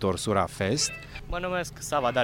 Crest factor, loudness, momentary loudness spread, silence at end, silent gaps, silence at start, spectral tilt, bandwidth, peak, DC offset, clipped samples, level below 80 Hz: 20 dB; -28 LUFS; 8 LU; 0 s; none; 0 s; -4 dB/octave; 18 kHz; -8 dBFS; under 0.1%; under 0.1%; -44 dBFS